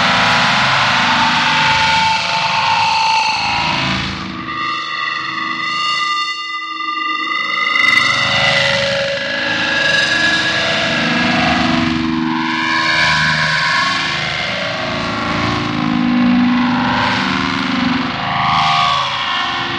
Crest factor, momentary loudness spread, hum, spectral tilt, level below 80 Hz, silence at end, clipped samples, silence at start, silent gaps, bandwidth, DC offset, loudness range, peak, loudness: 14 dB; 7 LU; none; -3.5 dB/octave; -44 dBFS; 0 s; under 0.1%; 0 s; none; 11 kHz; under 0.1%; 4 LU; 0 dBFS; -14 LUFS